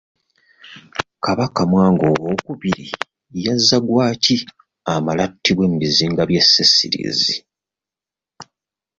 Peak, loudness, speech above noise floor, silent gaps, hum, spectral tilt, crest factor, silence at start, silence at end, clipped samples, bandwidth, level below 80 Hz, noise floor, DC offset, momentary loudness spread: 0 dBFS; -16 LUFS; 72 dB; none; none; -4.5 dB/octave; 18 dB; 0.65 s; 0.55 s; under 0.1%; 7.8 kHz; -50 dBFS; -89 dBFS; under 0.1%; 16 LU